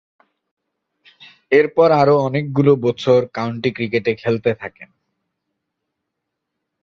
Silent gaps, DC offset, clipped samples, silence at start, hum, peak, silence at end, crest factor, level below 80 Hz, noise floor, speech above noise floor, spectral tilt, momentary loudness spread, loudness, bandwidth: none; under 0.1%; under 0.1%; 1.5 s; none; 0 dBFS; 2 s; 18 dB; -58 dBFS; -78 dBFS; 62 dB; -7.5 dB/octave; 9 LU; -17 LUFS; 7 kHz